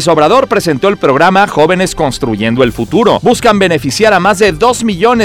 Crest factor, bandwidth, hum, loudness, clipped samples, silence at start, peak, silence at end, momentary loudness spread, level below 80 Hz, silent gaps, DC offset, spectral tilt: 8 dB; 16.5 kHz; none; -9 LUFS; 0.9%; 0 s; 0 dBFS; 0 s; 4 LU; -34 dBFS; none; under 0.1%; -5 dB/octave